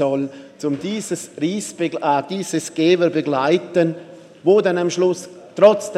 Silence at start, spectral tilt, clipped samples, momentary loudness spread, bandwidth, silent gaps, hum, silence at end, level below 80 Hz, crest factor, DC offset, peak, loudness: 0 s; -5 dB/octave; under 0.1%; 11 LU; 13.5 kHz; none; none; 0 s; -70 dBFS; 18 dB; under 0.1%; 0 dBFS; -19 LUFS